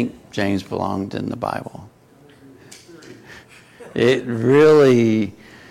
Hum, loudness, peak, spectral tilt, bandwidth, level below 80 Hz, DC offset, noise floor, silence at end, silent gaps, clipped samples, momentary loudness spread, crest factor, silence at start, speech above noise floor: none; -18 LUFS; -6 dBFS; -7 dB/octave; 13.5 kHz; -56 dBFS; under 0.1%; -49 dBFS; 0.4 s; none; under 0.1%; 16 LU; 14 dB; 0 s; 33 dB